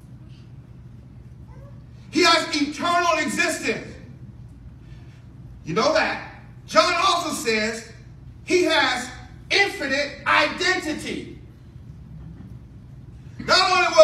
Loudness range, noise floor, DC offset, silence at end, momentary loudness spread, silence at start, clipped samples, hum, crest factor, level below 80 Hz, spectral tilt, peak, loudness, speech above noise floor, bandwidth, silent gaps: 4 LU; -43 dBFS; under 0.1%; 0 s; 25 LU; 0.05 s; under 0.1%; none; 22 dB; -48 dBFS; -3 dB/octave; 0 dBFS; -20 LUFS; 20 dB; 15 kHz; none